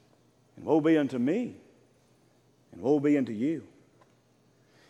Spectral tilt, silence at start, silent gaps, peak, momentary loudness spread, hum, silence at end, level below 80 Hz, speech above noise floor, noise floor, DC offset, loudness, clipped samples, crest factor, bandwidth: -8 dB/octave; 0.55 s; none; -12 dBFS; 13 LU; none; 1.25 s; -76 dBFS; 38 dB; -65 dBFS; under 0.1%; -28 LUFS; under 0.1%; 18 dB; 8.6 kHz